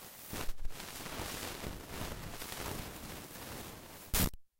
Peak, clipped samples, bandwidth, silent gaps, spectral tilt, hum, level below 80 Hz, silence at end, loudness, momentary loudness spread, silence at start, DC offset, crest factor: -20 dBFS; under 0.1%; 16 kHz; none; -3 dB/octave; none; -46 dBFS; 0.15 s; -41 LUFS; 12 LU; 0 s; under 0.1%; 20 dB